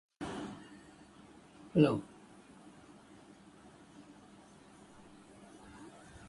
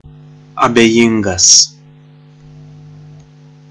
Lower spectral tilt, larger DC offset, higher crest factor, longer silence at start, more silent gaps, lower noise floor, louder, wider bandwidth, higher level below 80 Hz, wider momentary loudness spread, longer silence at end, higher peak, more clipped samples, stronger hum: first, -7.5 dB/octave vs -2 dB/octave; neither; first, 26 dB vs 14 dB; second, 0.2 s vs 0.55 s; neither; first, -58 dBFS vs -41 dBFS; second, -34 LUFS vs -9 LUFS; about the same, 11.5 kHz vs 10.5 kHz; second, -68 dBFS vs -48 dBFS; first, 28 LU vs 10 LU; second, 0 s vs 2.05 s; second, -14 dBFS vs 0 dBFS; neither; second, none vs 50 Hz at -40 dBFS